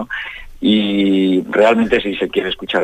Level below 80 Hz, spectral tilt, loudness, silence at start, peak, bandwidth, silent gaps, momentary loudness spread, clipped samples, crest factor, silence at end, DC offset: -42 dBFS; -6.5 dB/octave; -16 LUFS; 0 s; -2 dBFS; 9.2 kHz; none; 10 LU; under 0.1%; 14 dB; 0 s; under 0.1%